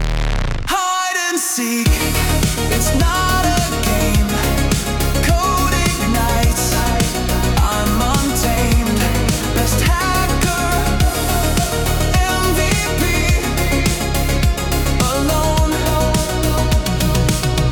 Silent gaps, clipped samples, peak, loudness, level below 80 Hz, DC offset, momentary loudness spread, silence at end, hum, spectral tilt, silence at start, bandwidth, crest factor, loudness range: none; under 0.1%; -2 dBFS; -16 LUFS; -20 dBFS; under 0.1%; 2 LU; 0 s; none; -4 dB/octave; 0 s; 19 kHz; 14 dB; 1 LU